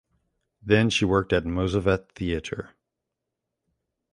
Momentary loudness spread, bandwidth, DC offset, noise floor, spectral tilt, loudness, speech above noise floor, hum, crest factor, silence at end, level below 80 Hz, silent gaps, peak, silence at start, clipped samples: 13 LU; 11.5 kHz; under 0.1%; -84 dBFS; -6 dB/octave; -24 LUFS; 60 dB; none; 22 dB; 1.45 s; -44 dBFS; none; -4 dBFS; 0.65 s; under 0.1%